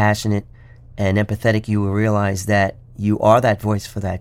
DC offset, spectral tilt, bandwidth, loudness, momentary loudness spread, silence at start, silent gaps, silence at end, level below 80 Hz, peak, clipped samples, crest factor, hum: under 0.1%; -6.5 dB/octave; 15.5 kHz; -19 LUFS; 9 LU; 0 s; none; 0 s; -44 dBFS; -2 dBFS; under 0.1%; 18 dB; none